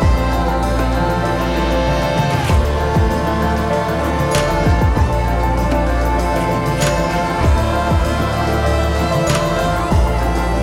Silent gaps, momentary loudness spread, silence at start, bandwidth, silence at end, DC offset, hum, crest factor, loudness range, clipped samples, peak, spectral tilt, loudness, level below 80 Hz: none; 2 LU; 0 s; 16 kHz; 0 s; under 0.1%; none; 10 dB; 0 LU; under 0.1%; -4 dBFS; -6 dB/octave; -16 LUFS; -20 dBFS